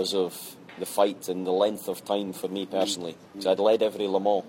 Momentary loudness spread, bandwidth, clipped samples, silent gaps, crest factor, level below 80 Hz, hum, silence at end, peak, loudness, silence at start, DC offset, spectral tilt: 11 LU; 16.5 kHz; under 0.1%; none; 18 dB; -74 dBFS; none; 0 s; -8 dBFS; -27 LUFS; 0 s; under 0.1%; -4 dB/octave